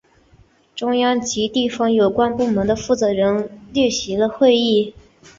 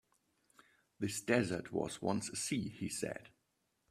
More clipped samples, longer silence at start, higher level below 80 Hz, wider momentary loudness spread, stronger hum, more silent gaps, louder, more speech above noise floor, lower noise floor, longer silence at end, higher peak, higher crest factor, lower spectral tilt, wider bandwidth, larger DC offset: neither; second, 0.75 s vs 1 s; first, -48 dBFS vs -72 dBFS; about the same, 8 LU vs 9 LU; neither; neither; first, -18 LUFS vs -38 LUFS; second, 36 dB vs 44 dB; second, -53 dBFS vs -82 dBFS; about the same, 0.5 s vs 0.6 s; first, -4 dBFS vs -16 dBFS; second, 16 dB vs 24 dB; about the same, -4.5 dB/octave vs -4.5 dB/octave; second, 7.8 kHz vs 15.5 kHz; neither